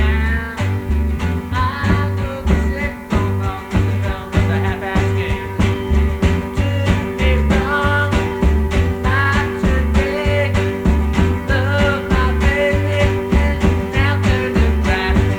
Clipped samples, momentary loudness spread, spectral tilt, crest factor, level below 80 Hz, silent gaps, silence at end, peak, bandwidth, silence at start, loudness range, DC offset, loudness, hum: under 0.1%; 5 LU; -7 dB/octave; 16 dB; -20 dBFS; none; 0 s; 0 dBFS; 17 kHz; 0 s; 3 LU; under 0.1%; -17 LUFS; none